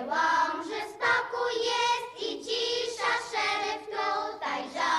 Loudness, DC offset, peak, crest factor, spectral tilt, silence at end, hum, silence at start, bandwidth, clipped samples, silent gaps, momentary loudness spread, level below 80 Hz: -29 LUFS; under 0.1%; -14 dBFS; 14 dB; -1 dB/octave; 0 s; none; 0 s; 13 kHz; under 0.1%; none; 7 LU; -70 dBFS